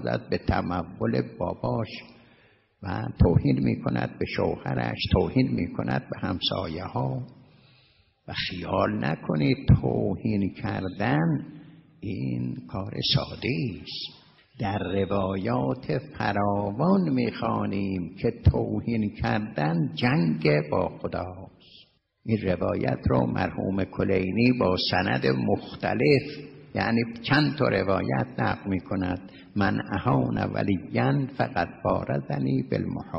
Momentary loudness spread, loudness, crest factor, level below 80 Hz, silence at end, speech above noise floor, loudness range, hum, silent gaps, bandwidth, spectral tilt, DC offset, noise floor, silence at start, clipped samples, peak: 10 LU; -26 LUFS; 18 dB; -44 dBFS; 0 s; 36 dB; 4 LU; none; none; 6 kHz; -9 dB/octave; under 0.1%; -62 dBFS; 0 s; under 0.1%; -8 dBFS